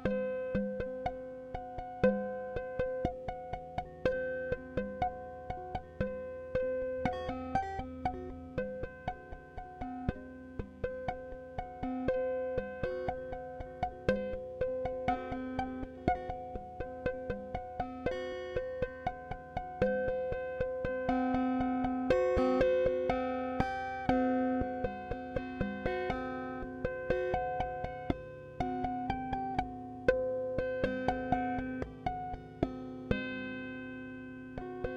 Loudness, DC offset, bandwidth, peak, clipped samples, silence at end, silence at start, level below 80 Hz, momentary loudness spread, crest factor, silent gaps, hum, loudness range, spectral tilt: -36 LUFS; under 0.1%; 7.8 kHz; -14 dBFS; under 0.1%; 0 s; 0 s; -50 dBFS; 12 LU; 22 dB; none; none; 8 LU; -8 dB/octave